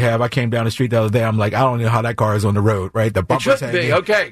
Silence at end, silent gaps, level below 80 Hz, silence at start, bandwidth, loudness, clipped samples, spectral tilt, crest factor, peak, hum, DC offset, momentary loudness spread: 0 s; none; -48 dBFS; 0 s; 14 kHz; -17 LUFS; under 0.1%; -6.5 dB/octave; 12 dB; -4 dBFS; none; under 0.1%; 3 LU